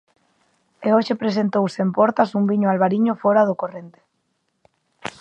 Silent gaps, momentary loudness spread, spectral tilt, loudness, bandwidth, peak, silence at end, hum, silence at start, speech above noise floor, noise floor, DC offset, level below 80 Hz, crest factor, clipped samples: none; 12 LU; -7.5 dB/octave; -19 LUFS; 8.8 kHz; -2 dBFS; 0.1 s; none; 0.8 s; 52 dB; -71 dBFS; under 0.1%; -70 dBFS; 18 dB; under 0.1%